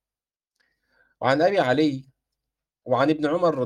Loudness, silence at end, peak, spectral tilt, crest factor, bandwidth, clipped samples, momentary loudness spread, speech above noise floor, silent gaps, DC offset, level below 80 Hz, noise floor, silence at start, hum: -22 LUFS; 0 s; -6 dBFS; -6.5 dB/octave; 18 dB; 9.8 kHz; under 0.1%; 7 LU; over 69 dB; none; under 0.1%; -68 dBFS; under -90 dBFS; 1.2 s; none